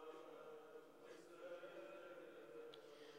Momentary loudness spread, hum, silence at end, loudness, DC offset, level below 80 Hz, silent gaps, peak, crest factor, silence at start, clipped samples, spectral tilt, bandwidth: 6 LU; none; 0 s; -59 LUFS; under 0.1%; under -90 dBFS; none; -44 dBFS; 16 dB; 0 s; under 0.1%; -4 dB/octave; 15.5 kHz